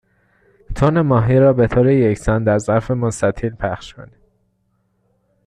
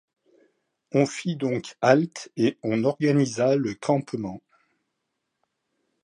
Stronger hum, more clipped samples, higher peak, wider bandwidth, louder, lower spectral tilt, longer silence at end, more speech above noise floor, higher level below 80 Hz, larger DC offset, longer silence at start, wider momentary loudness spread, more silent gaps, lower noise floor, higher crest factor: neither; neither; about the same, -2 dBFS vs -4 dBFS; about the same, 10.5 kHz vs 11 kHz; first, -16 LUFS vs -24 LUFS; first, -8 dB/octave vs -6 dB/octave; second, 1.4 s vs 1.65 s; second, 49 dB vs 56 dB; first, -36 dBFS vs -68 dBFS; neither; second, 0.7 s vs 0.95 s; about the same, 12 LU vs 11 LU; neither; second, -65 dBFS vs -80 dBFS; second, 16 dB vs 22 dB